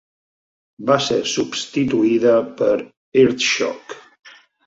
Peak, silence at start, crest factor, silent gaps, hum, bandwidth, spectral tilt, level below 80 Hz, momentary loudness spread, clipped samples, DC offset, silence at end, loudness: -2 dBFS; 0.8 s; 18 dB; 2.97-3.12 s; none; 8 kHz; -4 dB/octave; -58 dBFS; 11 LU; under 0.1%; under 0.1%; 0.4 s; -18 LUFS